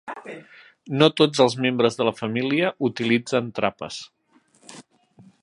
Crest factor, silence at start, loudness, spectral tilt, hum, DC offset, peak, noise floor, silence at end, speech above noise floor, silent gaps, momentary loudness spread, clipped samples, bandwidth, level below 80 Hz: 22 dB; 0.05 s; -21 LUFS; -5 dB/octave; none; under 0.1%; 0 dBFS; -61 dBFS; 0.6 s; 39 dB; none; 18 LU; under 0.1%; 11.5 kHz; -66 dBFS